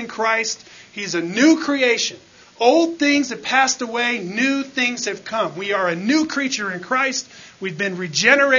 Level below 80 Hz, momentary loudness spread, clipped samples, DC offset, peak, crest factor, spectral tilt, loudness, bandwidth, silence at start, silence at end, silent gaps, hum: -68 dBFS; 10 LU; under 0.1%; under 0.1%; 0 dBFS; 20 dB; -3 dB/octave; -19 LUFS; 7.4 kHz; 0 s; 0 s; none; none